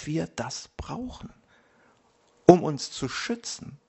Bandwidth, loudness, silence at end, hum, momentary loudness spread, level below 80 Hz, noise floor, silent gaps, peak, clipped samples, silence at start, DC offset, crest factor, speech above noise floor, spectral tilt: 8.2 kHz; -26 LUFS; 0.15 s; none; 19 LU; -54 dBFS; -64 dBFS; none; 0 dBFS; under 0.1%; 0 s; under 0.1%; 26 dB; 36 dB; -5.5 dB/octave